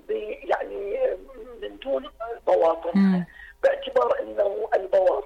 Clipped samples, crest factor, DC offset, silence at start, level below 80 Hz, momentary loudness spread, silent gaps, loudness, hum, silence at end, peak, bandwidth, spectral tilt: under 0.1%; 12 dB; under 0.1%; 0.1 s; -54 dBFS; 14 LU; none; -24 LUFS; none; 0 s; -12 dBFS; 7.4 kHz; -8 dB/octave